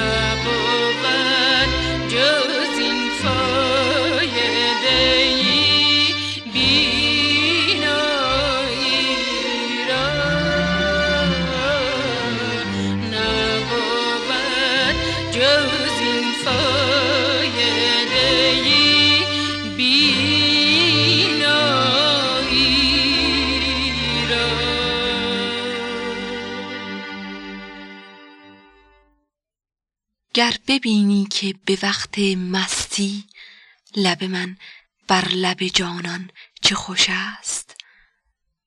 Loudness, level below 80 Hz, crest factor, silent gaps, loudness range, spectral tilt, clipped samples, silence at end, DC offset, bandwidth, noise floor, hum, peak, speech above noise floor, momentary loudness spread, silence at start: -17 LUFS; -40 dBFS; 16 dB; none; 9 LU; -3 dB/octave; under 0.1%; 0.95 s; under 0.1%; 12.5 kHz; -83 dBFS; none; -2 dBFS; 62 dB; 11 LU; 0 s